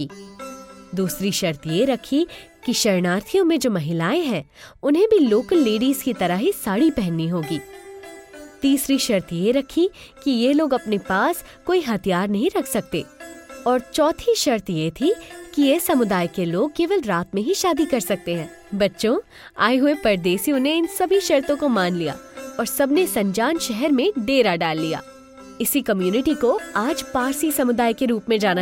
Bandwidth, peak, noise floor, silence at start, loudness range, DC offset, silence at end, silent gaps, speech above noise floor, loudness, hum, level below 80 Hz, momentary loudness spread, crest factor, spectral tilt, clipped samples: 17 kHz; -4 dBFS; -41 dBFS; 0 s; 3 LU; under 0.1%; 0 s; none; 21 dB; -21 LUFS; none; -52 dBFS; 10 LU; 18 dB; -4.5 dB/octave; under 0.1%